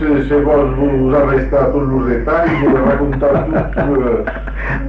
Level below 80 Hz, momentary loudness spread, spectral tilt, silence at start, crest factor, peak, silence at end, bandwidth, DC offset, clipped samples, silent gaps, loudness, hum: -24 dBFS; 5 LU; -10 dB/octave; 0 s; 10 dB; -4 dBFS; 0 s; 5.6 kHz; under 0.1%; under 0.1%; none; -14 LUFS; none